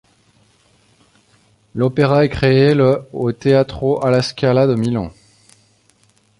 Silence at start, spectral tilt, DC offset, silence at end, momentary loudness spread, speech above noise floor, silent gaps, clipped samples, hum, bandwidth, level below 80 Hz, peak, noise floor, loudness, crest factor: 1.75 s; -7.5 dB/octave; under 0.1%; 1.3 s; 9 LU; 42 dB; none; under 0.1%; none; 11.5 kHz; -44 dBFS; -2 dBFS; -56 dBFS; -16 LUFS; 16 dB